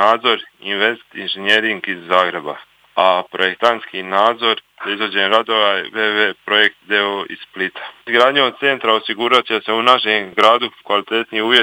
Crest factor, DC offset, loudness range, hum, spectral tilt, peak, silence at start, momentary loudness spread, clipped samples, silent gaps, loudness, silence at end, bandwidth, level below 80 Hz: 16 dB; under 0.1%; 3 LU; none; -3.5 dB/octave; 0 dBFS; 0 s; 10 LU; under 0.1%; none; -16 LUFS; 0 s; 17.5 kHz; -70 dBFS